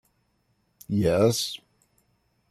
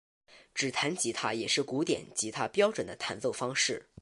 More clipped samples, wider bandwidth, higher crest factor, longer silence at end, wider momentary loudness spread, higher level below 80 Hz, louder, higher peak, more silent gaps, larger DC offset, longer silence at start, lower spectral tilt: neither; first, 15 kHz vs 11.5 kHz; about the same, 20 dB vs 20 dB; first, 0.95 s vs 0.2 s; first, 11 LU vs 6 LU; first, -56 dBFS vs -70 dBFS; first, -24 LUFS vs -31 LUFS; first, -8 dBFS vs -12 dBFS; neither; neither; first, 0.9 s vs 0.3 s; first, -5 dB/octave vs -2.5 dB/octave